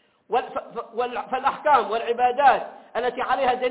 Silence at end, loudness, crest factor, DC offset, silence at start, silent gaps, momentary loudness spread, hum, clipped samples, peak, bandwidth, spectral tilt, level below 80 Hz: 0 s; -23 LUFS; 18 dB; under 0.1%; 0.3 s; none; 12 LU; none; under 0.1%; -6 dBFS; 4 kHz; -7 dB/octave; -60 dBFS